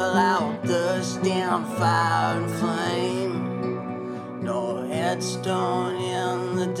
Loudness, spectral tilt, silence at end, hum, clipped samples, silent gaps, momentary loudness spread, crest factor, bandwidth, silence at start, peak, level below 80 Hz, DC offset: -25 LUFS; -5.5 dB/octave; 0 s; none; under 0.1%; none; 8 LU; 16 dB; 16 kHz; 0 s; -8 dBFS; -68 dBFS; under 0.1%